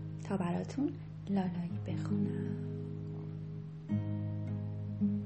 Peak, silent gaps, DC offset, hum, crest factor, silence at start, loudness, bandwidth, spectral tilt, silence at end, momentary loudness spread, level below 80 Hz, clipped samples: -22 dBFS; none; under 0.1%; none; 14 dB; 0 s; -38 LUFS; 8.4 kHz; -9 dB/octave; 0 s; 8 LU; -64 dBFS; under 0.1%